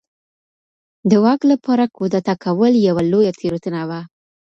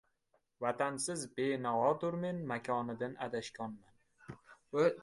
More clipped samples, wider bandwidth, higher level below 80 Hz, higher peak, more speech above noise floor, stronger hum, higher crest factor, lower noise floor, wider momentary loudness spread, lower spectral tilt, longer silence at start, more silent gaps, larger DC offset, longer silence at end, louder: neither; second, 7.6 kHz vs 11.5 kHz; first, -58 dBFS vs -74 dBFS; first, -2 dBFS vs -18 dBFS; first, over 74 dB vs 42 dB; neither; about the same, 16 dB vs 18 dB; first, under -90 dBFS vs -78 dBFS; second, 10 LU vs 20 LU; first, -7.5 dB/octave vs -5 dB/octave; first, 1.05 s vs 0.6 s; neither; neither; first, 0.45 s vs 0 s; first, -17 LUFS vs -37 LUFS